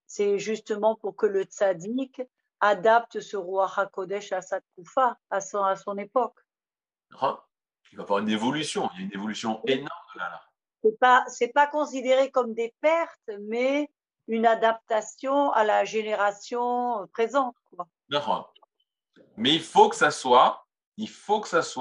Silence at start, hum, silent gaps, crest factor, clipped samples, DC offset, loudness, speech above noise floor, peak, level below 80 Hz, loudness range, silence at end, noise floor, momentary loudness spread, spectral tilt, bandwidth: 0.1 s; none; 20.86-20.92 s; 22 dB; under 0.1%; under 0.1%; -25 LUFS; over 65 dB; -4 dBFS; -82 dBFS; 6 LU; 0 s; under -90 dBFS; 15 LU; -3.5 dB/octave; 11 kHz